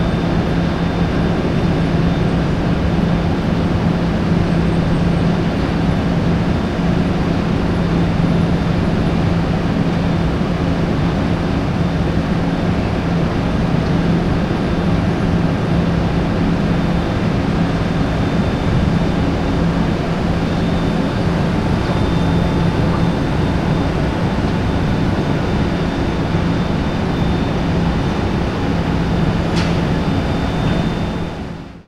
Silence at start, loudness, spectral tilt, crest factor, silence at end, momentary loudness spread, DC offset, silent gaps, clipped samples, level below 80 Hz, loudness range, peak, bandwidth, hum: 0 s; -17 LUFS; -7.5 dB/octave; 12 dB; 0.05 s; 2 LU; under 0.1%; none; under 0.1%; -26 dBFS; 1 LU; -2 dBFS; 10 kHz; none